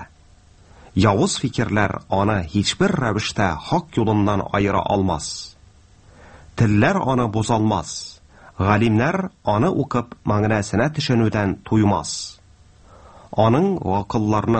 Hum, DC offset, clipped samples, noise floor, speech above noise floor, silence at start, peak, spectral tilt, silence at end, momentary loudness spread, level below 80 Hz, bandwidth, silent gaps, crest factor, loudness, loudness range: none; under 0.1%; under 0.1%; -50 dBFS; 31 dB; 0 s; 0 dBFS; -6 dB/octave; 0 s; 9 LU; -44 dBFS; 8.8 kHz; none; 20 dB; -20 LUFS; 2 LU